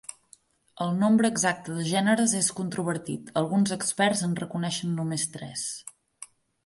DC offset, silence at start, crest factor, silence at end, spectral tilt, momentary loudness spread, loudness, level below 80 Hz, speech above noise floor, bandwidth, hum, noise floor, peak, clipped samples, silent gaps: under 0.1%; 0.1 s; 20 dB; 0.4 s; -4 dB/octave; 18 LU; -26 LUFS; -68 dBFS; 33 dB; 11.5 kHz; none; -59 dBFS; -8 dBFS; under 0.1%; none